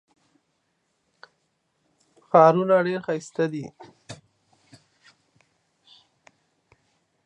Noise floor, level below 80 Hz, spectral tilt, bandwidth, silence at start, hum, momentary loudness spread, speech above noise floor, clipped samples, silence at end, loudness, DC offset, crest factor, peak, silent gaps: -73 dBFS; -74 dBFS; -7 dB/octave; 10 kHz; 2.35 s; none; 28 LU; 52 dB; under 0.1%; 3.1 s; -21 LUFS; under 0.1%; 24 dB; -2 dBFS; none